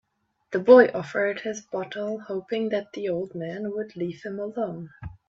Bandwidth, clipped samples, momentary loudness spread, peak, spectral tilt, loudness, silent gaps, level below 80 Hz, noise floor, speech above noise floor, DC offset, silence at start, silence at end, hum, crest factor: 7.2 kHz; under 0.1%; 17 LU; -2 dBFS; -6 dB/octave; -25 LUFS; none; -60 dBFS; -57 dBFS; 32 dB; under 0.1%; 0.5 s; 0.2 s; none; 22 dB